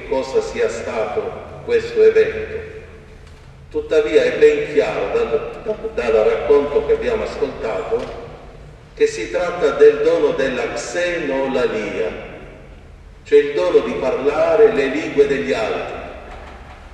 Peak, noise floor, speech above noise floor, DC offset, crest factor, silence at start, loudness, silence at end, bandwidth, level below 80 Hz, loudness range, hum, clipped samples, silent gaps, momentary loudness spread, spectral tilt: 0 dBFS; -40 dBFS; 23 dB; under 0.1%; 18 dB; 0 s; -18 LUFS; 0 s; 9 kHz; -42 dBFS; 4 LU; none; under 0.1%; none; 18 LU; -5 dB/octave